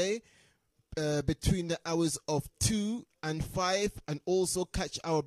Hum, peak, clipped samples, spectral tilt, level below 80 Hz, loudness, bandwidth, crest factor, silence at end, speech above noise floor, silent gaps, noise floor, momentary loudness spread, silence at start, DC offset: none; -14 dBFS; under 0.1%; -4.5 dB/octave; -46 dBFS; -32 LUFS; 13.5 kHz; 18 dB; 0 s; 38 dB; none; -70 dBFS; 7 LU; 0 s; under 0.1%